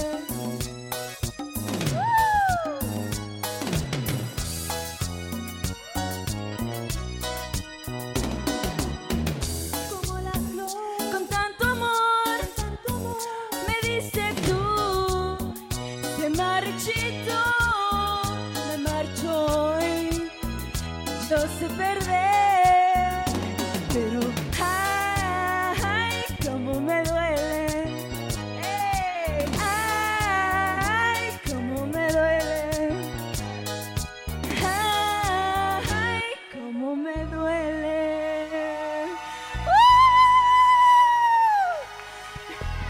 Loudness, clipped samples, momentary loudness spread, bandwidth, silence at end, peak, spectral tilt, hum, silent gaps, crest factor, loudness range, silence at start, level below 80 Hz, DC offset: -24 LUFS; under 0.1%; 12 LU; 17 kHz; 0 s; -8 dBFS; -4 dB/octave; none; none; 16 dB; 10 LU; 0 s; -40 dBFS; under 0.1%